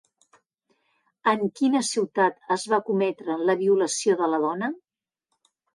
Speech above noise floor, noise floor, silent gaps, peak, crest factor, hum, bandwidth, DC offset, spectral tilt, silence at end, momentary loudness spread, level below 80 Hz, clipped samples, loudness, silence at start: 57 dB; -80 dBFS; none; -10 dBFS; 16 dB; none; 11.5 kHz; under 0.1%; -4 dB/octave; 0.95 s; 6 LU; -78 dBFS; under 0.1%; -24 LUFS; 1.25 s